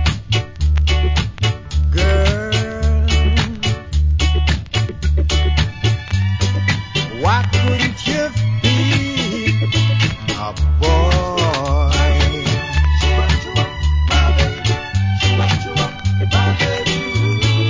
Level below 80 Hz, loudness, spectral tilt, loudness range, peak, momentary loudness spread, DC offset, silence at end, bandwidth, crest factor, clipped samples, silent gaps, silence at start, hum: -20 dBFS; -17 LUFS; -5 dB/octave; 1 LU; -2 dBFS; 5 LU; under 0.1%; 0 s; 7.6 kHz; 14 dB; under 0.1%; none; 0 s; none